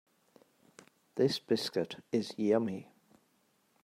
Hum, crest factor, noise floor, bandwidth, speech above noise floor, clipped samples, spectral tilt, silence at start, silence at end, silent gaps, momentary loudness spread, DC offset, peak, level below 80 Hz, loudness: none; 20 dB; -73 dBFS; 16 kHz; 41 dB; under 0.1%; -5.5 dB/octave; 1.15 s; 1 s; none; 9 LU; under 0.1%; -16 dBFS; -82 dBFS; -33 LUFS